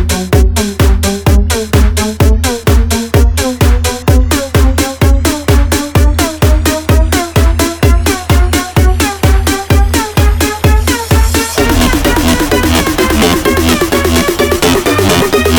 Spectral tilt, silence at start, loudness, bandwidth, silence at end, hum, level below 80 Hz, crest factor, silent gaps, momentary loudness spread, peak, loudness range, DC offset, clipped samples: -5 dB/octave; 0 s; -10 LUFS; over 20 kHz; 0 s; none; -12 dBFS; 8 dB; none; 2 LU; 0 dBFS; 1 LU; under 0.1%; under 0.1%